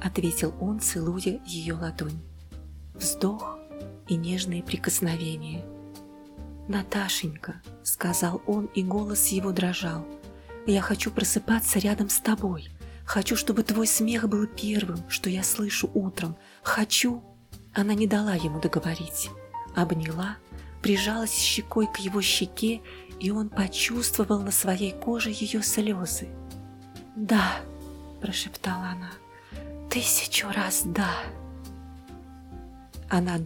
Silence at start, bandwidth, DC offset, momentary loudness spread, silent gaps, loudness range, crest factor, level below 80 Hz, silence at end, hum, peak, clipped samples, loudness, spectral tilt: 0 s; 18 kHz; under 0.1%; 20 LU; none; 5 LU; 18 dB; -48 dBFS; 0 s; none; -10 dBFS; under 0.1%; -27 LUFS; -3.5 dB/octave